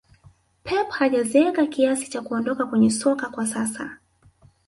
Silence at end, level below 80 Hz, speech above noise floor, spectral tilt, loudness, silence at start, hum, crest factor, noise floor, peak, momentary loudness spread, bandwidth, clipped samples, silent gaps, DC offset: 0.7 s; -60 dBFS; 34 dB; -4.5 dB/octave; -22 LUFS; 0.65 s; none; 18 dB; -56 dBFS; -6 dBFS; 9 LU; 11.5 kHz; under 0.1%; none; under 0.1%